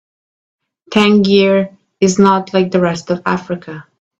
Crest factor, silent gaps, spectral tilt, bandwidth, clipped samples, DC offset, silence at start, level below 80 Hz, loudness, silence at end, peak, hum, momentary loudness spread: 14 dB; none; -5.5 dB/octave; 8.2 kHz; under 0.1%; under 0.1%; 0.9 s; -54 dBFS; -13 LUFS; 0.4 s; 0 dBFS; none; 14 LU